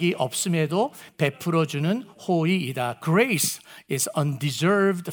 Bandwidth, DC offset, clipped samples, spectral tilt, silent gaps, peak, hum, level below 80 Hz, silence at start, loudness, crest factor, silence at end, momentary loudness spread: over 20 kHz; under 0.1%; under 0.1%; -5 dB/octave; none; -6 dBFS; none; -72 dBFS; 0 s; -24 LUFS; 18 dB; 0 s; 7 LU